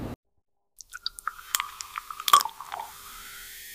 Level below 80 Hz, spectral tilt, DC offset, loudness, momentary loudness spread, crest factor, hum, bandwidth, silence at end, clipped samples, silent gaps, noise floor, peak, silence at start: -58 dBFS; -0.5 dB/octave; under 0.1%; -27 LUFS; 20 LU; 26 dB; none; 16 kHz; 0 s; under 0.1%; 0.16-0.23 s; -48 dBFS; -6 dBFS; 0 s